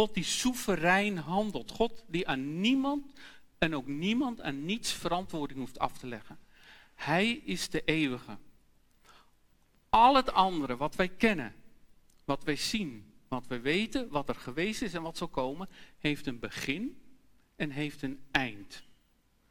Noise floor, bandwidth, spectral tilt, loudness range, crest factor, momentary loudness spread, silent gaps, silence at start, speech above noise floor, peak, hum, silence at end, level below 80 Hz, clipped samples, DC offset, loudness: -69 dBFS; 17.5 kHz; -4 dB/octave; 7 LU; 22 dB; 13 LU; none; 0 s; 37 dB; -10 dBFS; none; 0.6 s; -52 dBFS; under 0.1%; under 0.1%; -31 LUFS